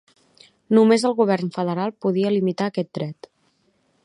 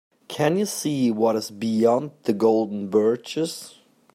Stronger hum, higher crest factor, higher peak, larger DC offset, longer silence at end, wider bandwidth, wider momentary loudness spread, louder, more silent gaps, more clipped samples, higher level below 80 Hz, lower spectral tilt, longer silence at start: neither; about the same, 18 dB vs 16 dB; about the same, -4 dBFS vs -6 dBFS; neither; first, 0.9 s vs 0.45 s; second, 11 kHz vs 16 kHz; first, 12 LU vs 8 LU; about the same, -21 LUFS vs -23 LUFS; neither; neither; about the same, -72 dBFS vs -70 dBFS; about the same, -6.5 dB/octave vs -5.5 dB/octave; first, 0.7 s vs 0.3 s